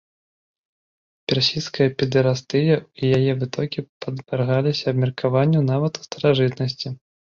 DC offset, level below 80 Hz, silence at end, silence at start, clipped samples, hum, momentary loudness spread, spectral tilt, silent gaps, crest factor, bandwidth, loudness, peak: under 0.1%; -58 dBFS; 0.25 s; 1.3 s; under 0.1%; none; 9 LU; -6.5 dB/octave; 3.89-4.00 s; 18 dB; 7.2 kHz; -21 LUFS; -4 dBFS